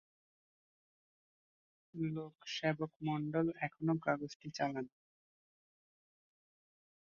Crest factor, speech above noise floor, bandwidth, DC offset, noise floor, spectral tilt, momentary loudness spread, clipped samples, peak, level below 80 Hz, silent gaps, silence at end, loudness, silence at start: 24 dB; over 52 dB; 7 kHz; under 0.1%; under -90 dBFS; -5 dB/octave; 9 LU; under 0.1%; -20 dBFS; -78 dBFS; 2.96-3.00 s, 4.35-4.40 s; 2.25 s; -39 LUFS; 1.95 s